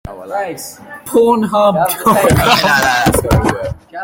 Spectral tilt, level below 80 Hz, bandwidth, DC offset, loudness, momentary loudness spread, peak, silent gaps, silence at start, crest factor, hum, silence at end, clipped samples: -4.5 dB/octave; -30 dBFS; 17 kHz; under 0.1%; -12 LUFS; 14 LU; 0 dBFS; none; 0.05 s; 14 dB; none; 0 s; under 0.1%